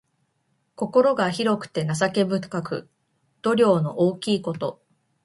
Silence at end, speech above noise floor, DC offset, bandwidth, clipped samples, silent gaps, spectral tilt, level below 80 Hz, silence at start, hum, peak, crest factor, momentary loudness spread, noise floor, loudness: 0.5 s; 49 dB; under 0.1%; 11.5 kHz; under 0.1%; none; -6 dB/octave; -64 dBFS; 0.8 s; none; -6 dBFS; 18 dB; 12 LU; -71 dBFS; -23 LUFS